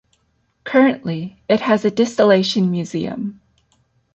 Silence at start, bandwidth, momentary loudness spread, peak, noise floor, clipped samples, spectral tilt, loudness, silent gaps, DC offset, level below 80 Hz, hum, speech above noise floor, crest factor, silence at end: 0.65 s; 8.4 kHz; 14 LU; -2 dBFS; -64 dBFS; under 0.1%; -6 dB/octave; -18 LUFS; none; under 0.1%; -60 dBFS; none; 48 dB; 16 dB; 0.8 s